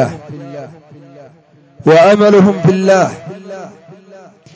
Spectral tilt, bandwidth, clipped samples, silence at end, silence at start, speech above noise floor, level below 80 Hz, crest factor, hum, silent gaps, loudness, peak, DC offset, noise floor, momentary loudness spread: -6.5 dB/octave; 8 kHz; under 0.1%; 0.85 s; 0 s; 28 dB; -54 dBFS; 14 dB; none; none; -10 LUFS; 0 dBFS; under 0.1%; -39 dBFS; 22 LU